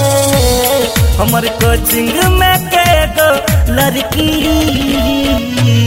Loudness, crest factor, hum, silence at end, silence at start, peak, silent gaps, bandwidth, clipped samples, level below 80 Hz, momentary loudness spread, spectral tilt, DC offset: -11 LUFS; 10 dB; none; 0 s; 0 s; 0 dBFS; none; 16.5 kHz; under 0.1%; -20 dBFS; 3 LU; -4.5 dB/octave; under 0.1%